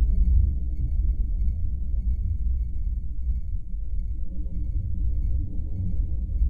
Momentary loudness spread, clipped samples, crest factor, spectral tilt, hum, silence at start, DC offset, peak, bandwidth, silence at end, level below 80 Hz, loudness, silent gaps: 9 LU; under 0.1%; 14 dB; -12 dB/octave; none; 0 s; under 0.1%; -10 dBFS; 0.7 kHz; 0 s; -24 dBFS; -29 LUFS; none